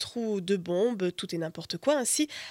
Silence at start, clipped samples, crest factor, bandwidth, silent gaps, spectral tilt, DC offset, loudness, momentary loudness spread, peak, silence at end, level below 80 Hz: 0 s; under 0.1%; 16 dB; 17 kHz; none; -3.5 dB/octave; under 0.1%; -29 LUFS; 8 LU; -14 dBFS; 0 s; -72 dBFS